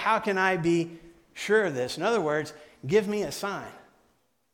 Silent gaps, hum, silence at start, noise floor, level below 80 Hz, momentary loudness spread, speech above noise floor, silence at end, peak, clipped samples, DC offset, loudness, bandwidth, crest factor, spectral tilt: none; none; 0 s; -69 dBFS; -64 dBFS; 15 LU; 43 dB; 0.75 s; -10 dBFS; under 0.1%; under 0.1%; -27 LUFS; 17 kHz; 18 dB; -5 dB/octave